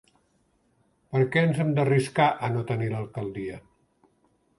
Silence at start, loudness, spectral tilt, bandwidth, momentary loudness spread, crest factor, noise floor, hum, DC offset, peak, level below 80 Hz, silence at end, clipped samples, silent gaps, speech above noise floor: 1.1 s; -25 LUFS; -7 dB/octave; 11.5 kHz; 12 LU; 20 dB; -68 dBFS; none; under 0.1%; -8 dBFS; -62 dBFS; 1 s; under 0.1%; none; 43 dB